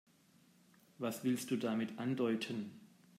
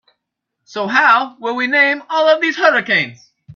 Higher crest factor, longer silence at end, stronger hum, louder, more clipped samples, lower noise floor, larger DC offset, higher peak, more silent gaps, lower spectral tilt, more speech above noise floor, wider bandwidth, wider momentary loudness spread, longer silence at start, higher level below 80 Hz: about the same, 16 dB vs 16 dB; first, 0.35 s vs 0 s; neither; second, -39 LUFS vs -14 LUFS; neither; second, -68 dBFS vs -77 dBFS; neither; second, -24 dBFS vs 0 dBFS; neither; first, -5.5 dB/octave vs -4 dB/octave; second, 31 dB vs 62 dB; first, 16 kHz vs 7.2 kHz; second, 7 LU vs 11 LU; first, 1 s vs 0.7 s; second, -88 dBFS vs -66 dBFS